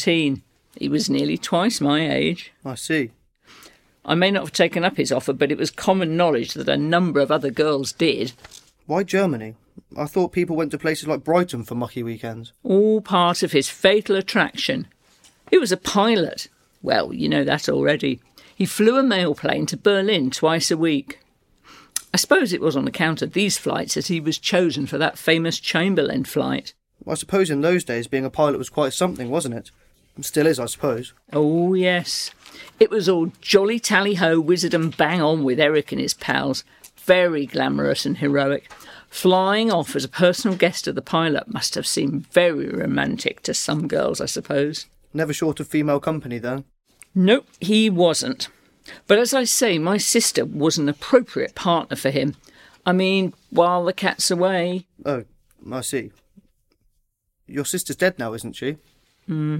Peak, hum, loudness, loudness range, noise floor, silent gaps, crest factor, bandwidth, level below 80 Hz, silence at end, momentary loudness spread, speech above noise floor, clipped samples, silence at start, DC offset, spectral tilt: -2 dBFS; none; -21 LUFS; 4 LU; -69 dBFS; none; 18 dB; 16.5 kHz; -58 dBFS; 0 s; 12 LU; 49 dB; under 0.1%; 0 s; under 0.1%; -4.5 dB/octave